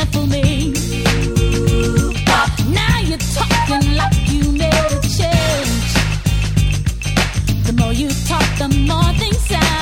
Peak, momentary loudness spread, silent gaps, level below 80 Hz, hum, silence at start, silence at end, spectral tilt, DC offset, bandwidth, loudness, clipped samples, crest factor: 0 dBFS; 3 LU; none; -22 dBFS; none; 0 s; 0 s; -5 dB/octave; under 0.1%; 19 kHz; -16 LUFS; under 0.1%; 14 dB